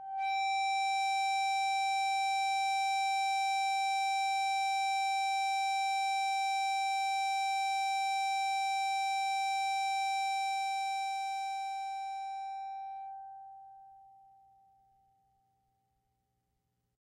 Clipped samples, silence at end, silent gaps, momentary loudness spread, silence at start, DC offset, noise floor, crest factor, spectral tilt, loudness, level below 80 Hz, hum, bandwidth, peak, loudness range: under 0.1%; 3.1 s; none; 9 LU; 0 s; under 0.1%; -81 dBFS; 10 dB; 4 dB/octave; -32 LUFS; -86 dBFS; 60 Hz at -85 dBFS; 15 kHz; -24 dBFS; 12 LU